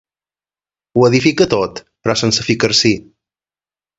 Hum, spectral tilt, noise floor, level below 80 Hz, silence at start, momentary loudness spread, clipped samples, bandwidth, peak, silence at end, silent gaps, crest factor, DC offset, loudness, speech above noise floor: none; -4 dB/octave; under -90 dBFS; -48 dBFS; 0.95 s; 10 LU; under 0.1%; 8 kHz; 0 dBFS; 1 s; none; 16 dB; under 0.1%; -14 LUFS; over 76 dB